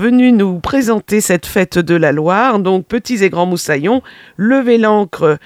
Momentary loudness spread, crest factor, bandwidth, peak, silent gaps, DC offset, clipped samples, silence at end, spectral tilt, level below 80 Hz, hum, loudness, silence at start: 5 LU; 12 dB; 16 kHz; 0 dBFS; none; under 0.1%; under 0.1%; 0.05 s; -5.5 dB/octave; -44 dBFS; none; -13 LUFS; 0 s